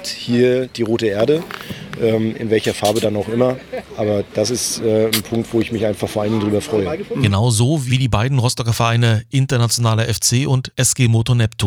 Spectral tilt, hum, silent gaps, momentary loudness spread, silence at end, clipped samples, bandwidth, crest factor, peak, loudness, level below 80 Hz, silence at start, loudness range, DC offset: -5 dB/octave; none; none; 5 LU; 0 s; under 0.1%; 19 kHz; 16 dB; -2 dBFS; -17 LUFS; -44 dBFS; 0 s; 3 LU; under 0.1%